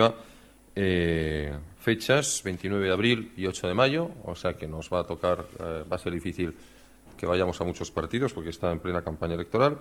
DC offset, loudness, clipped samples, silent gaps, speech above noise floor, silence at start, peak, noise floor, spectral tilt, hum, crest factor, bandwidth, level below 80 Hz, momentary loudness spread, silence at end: under 0.1%; -28 LUFS; under 0.1%; none; 25 dB; 0 s; -6 dBFS; -53 dBFS; -5 dB/octave; none; 22 dB; 16.5 kHz; -48 dBFS; 10 LU; 0 s